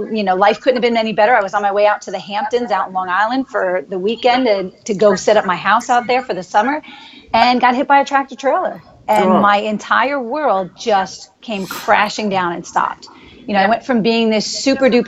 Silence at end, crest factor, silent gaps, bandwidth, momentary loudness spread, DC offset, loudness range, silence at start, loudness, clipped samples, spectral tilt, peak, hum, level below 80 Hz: 0 s; 16 dB; none; 15.5 kHz; 9 LU; under 0.1%; 3 LU; 0 s; -15 LUFS; under 0.1%; -4.5 dB/octave; 0 dBFS; none; -56 dBFS